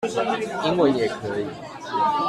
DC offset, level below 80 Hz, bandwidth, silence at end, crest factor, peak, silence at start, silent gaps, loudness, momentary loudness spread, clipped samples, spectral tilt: under 0.1%; -58 dBFS; 13 kHz; 0 s; 16 dB; -6 dBFS; 0 s; none; -24 LUFS; 10 LU; under 0.1%; -5.5 dB/octave